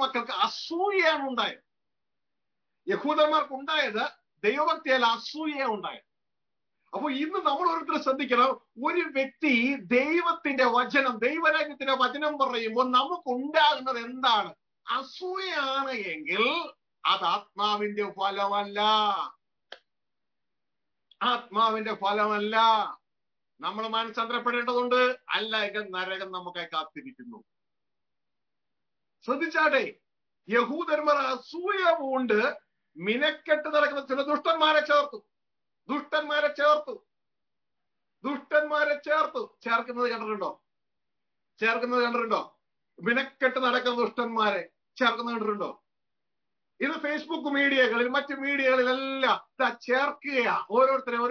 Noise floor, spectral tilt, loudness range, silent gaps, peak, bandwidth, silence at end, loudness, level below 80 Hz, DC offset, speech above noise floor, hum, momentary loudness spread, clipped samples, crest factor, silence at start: under -90 dBFS; -4 dB/octave; 5 LU; none; -10 dBFS; 5.4 kHz; 0 s; -27 LUFS; -80 dBFS; under 0.1%; over 63 dB; none; 10 LU; under 0.1%; 18 dB; 0 s